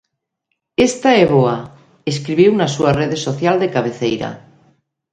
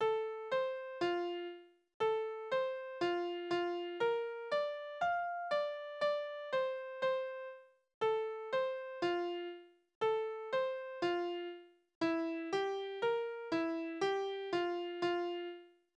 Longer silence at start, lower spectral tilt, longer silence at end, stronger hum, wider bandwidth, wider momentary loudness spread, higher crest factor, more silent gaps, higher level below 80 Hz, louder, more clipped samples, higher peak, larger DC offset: first, 0.8 s vs 0 s; about the same, -5.5 dB/octave vs -5 dB/octave; first, 0.75 s vs 0.3 s; neither; about the same, 9.6 kHz vs 8.8 kHz; first, 12 LU vs 8 LU; about the same, 16 dB vs 14 dB; second, none vs 1.94-2.00 s, 7.94-8.01 s, 9.95-10.01 s, 11.95-12.01 s; first, -48 dBFS vs -82 dBFS; first, -16 LUFS vs -38 LUFS; neither; first, 0 dBFS vs -22 dBFS; neither